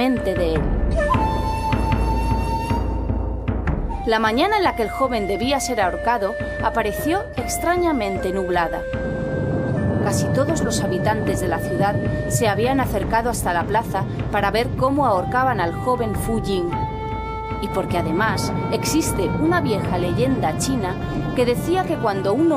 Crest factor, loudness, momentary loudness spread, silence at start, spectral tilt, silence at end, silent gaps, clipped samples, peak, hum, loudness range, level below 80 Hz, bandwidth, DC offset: 16 dB; -21 LUFS; 6 LU; 0 s; -5.5 dB/octave; 0 s; none; under 0.1%; -4 dBFS; none; 2 LU; -30 dBFS; 16 kHz; under 0.1%